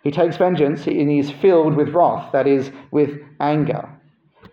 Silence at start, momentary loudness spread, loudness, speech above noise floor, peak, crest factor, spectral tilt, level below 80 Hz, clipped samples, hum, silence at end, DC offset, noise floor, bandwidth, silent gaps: 0.05 s; 8 LU; -18 LUFS; 35 dB; -4 dBFS; 14 dB; -8.5 dB/octave; -62 dBFS; under 0.1%; none; 0.65 s; under 0.1%; -53 dBFS; 7 kHz; none